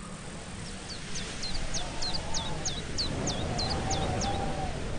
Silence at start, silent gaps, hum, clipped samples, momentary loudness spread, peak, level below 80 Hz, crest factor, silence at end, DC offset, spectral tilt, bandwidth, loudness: 0 s; none; none; under 0.1%; 10 LU; -16 dBFS; -38 dBFS; 16 dB; 0 s; under 0.1%; -3.5 dB/octave; 10 kHz; -33 LUFS